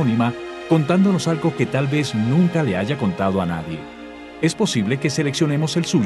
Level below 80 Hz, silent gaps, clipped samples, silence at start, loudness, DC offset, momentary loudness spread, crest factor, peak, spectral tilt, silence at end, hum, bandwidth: -52 dBFS; none; under 0.1%; 0 s; -20 LUFS; under 0.1%; 12 LU; 14 dB; -4 dBFS; -6 dB/octave; 0 s; none; 12 kHz